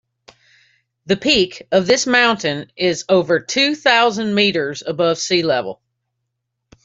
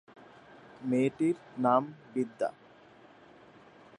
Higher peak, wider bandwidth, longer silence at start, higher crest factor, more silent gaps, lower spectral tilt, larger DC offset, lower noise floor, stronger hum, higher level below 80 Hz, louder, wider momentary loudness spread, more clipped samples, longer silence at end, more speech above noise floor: first, -2 dBFS vs -12 dBFS; second, 8 kHz vs 10.5 kHz; first, 1.05 s vs 0.8 s; second, 16 dB vs 22 dB; neither; second, -3.5 dB/octave vs -7.5 dB/octave; neither; first, -76 dBFS vs -57 dBFS; neither; first, -54 dBFS vs -78 dBFS; first, -16 LUFS vs -31 LUFS; about the same, 8 LU vs 9 LU; neither; second, 1.1 s vs 1.5 s; first, 59 dB vs 27 dB